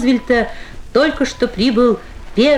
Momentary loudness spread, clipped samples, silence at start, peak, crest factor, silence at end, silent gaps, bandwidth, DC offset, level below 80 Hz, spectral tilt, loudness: 10 LU; under 0.1%; 0 s; -2 dBFS; 14 dB; 0 s; none; 11 kHz; under 0.1%; -34 dBFS; -5 dB/octave; -16 LUFS